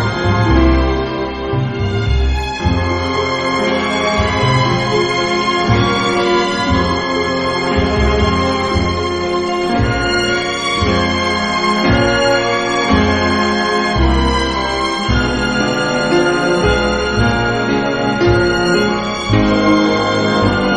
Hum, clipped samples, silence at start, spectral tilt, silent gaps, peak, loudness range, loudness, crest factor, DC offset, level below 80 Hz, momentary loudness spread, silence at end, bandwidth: none; under 0.1%; 0 s; -5.5 dB/octave; none; 0 dBFS; 2 LU; -14 LUFS; 14 dB; under 0.1%; -24 dBFS; 4 LU; 0 s; 10 kHz